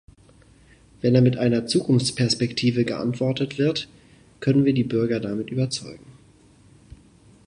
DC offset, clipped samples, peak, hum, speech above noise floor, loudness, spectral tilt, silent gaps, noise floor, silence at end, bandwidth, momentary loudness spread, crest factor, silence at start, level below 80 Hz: under 0.1%; under 0.1%; -4 dBFS; none; 32 dB; -22 LUFS; -6 dB/octave; none; -53 dBFS; 1.35 s; 11 kHz; 9 LU; 18 dB; 1.05 s; -56 dBFS